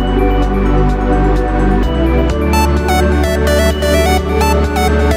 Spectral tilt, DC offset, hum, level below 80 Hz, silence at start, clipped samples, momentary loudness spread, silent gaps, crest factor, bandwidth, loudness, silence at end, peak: -6 dB/octave; under 0.1%; none; -14 dBFS; 0 s; under 0.1%; 2 LU; none; 10 dB; 16.5 kHz; -13 LUFS; 0 s; 0 dBFS